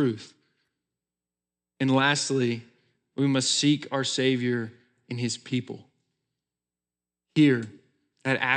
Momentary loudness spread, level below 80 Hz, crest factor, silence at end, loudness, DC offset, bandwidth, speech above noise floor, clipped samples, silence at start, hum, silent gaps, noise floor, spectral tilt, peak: 17 LU; -86 dBFS; 20 dB; 0 s; -25 LUFS; under 0.1%; 10 kHz; over 65 dB; under 0.1%; 0 s; none; none; under -90 dBFS; -4.5 dB/octave; -8 dBFS